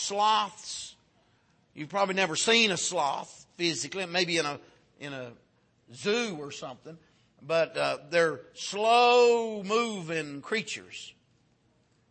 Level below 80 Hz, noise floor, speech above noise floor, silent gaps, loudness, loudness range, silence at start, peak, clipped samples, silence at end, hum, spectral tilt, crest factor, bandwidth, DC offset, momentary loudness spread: -76 dBFS; -68 dBFS; 40 dB; none; -27 LUFS; 7 LU; 0 s; -10 dBFS; under 0.1%; 1 s; none; -2.5 dB/octave; 18 dB; 8.8 kHz; under 0.1%; 21 LU